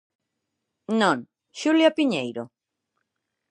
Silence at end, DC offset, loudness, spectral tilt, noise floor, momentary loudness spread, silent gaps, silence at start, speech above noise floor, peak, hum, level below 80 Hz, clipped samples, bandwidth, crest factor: 1.05 s; under 0.1%; -23 LUFS; -4.5 dB/octave; -81 dBFS; 18 LU; none; 0.9 s; 59 dB; -6 dBFS; none; -80 dBFS; under 0.1%; 10.5 kHz; 20 dB